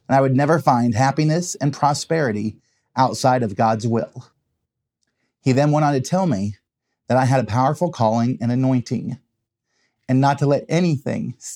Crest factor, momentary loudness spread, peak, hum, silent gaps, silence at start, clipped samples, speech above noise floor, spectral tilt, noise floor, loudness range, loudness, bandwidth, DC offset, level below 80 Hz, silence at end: 18 dB; 10 LU; 0 dBFS; none; none; 0.1 s; under 0.1%; 59 dB; -6.5 dB/octave; -78 dBFS; 3 LU; -19 LUFS; 14 kHz; under 0.1%; -66 dBFS; 0 s